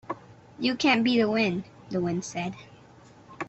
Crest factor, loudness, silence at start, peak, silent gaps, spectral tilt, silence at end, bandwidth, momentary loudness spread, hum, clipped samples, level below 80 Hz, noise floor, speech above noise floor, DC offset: 18 dB; -26 LUFS; 0.1 s; -10 dBFS; none; -5 dB/octave; 0 s; 8.2 kHz; 16 LU; none; under 0.1%; -64 dBFS; -52 dBFS; 27 dB; under 0.1%